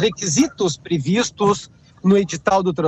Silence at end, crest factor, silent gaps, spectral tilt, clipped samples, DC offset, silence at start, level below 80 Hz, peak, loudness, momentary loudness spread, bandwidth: 0 s; 12 dB; none; -4.5 dB/octave; under 0.1%; under 0.1%; 0 s; -52 dBFS; -6 dBFS; -19 LUFS; 6 LU; 8.6 kHz